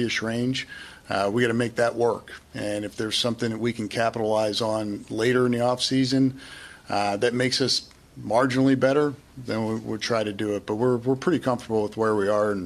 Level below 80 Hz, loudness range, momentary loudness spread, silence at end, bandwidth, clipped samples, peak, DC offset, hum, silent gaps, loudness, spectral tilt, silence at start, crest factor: -58 dBFS; 2 LU; 9 LU; 0 s; 13.5 kHz; under 0.1%; -6 dBFS; under 0.1%; none; none; -24 LUFS; -5 dB/octave; 0 s; 18 dB